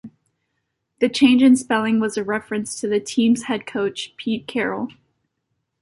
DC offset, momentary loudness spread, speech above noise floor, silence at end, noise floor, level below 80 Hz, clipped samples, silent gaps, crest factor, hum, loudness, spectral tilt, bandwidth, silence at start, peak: under 0.1%; 12 LU; 56 dB; 0.9 s; -75 dBFS; -62 dBFS; under 0.1%; none; 18 dB; none; -20 LUFS; -4 dB/octave; 11.5 kHz; 0.05 s; -4 dBFS